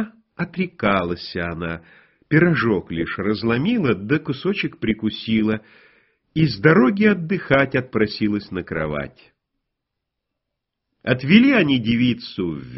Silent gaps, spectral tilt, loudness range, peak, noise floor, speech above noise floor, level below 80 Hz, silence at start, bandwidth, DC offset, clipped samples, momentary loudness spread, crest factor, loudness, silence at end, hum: none; -5 dB/octave; 4 LU; 0 dBFS; -81 dBFS; 61 dB; -50 dBFS; 0 s; 6 kHz; under 0.1%; under 0.1%; 14 LU; 20 dB; -20 LUFS; 0 s; none